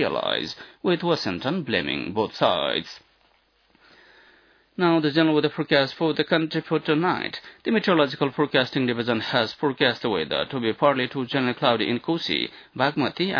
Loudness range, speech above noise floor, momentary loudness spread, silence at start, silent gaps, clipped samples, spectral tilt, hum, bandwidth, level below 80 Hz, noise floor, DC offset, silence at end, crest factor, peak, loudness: 4 LU; 39 dB; 6 LU; 0 s; none; under 0.1%; -6.5 dB/octave; none; 5.4 kHz; -64 dBFS; -63 dBFS; under 0.1%; 0 s; 20 dB; -4 dBFS; -23 LUFS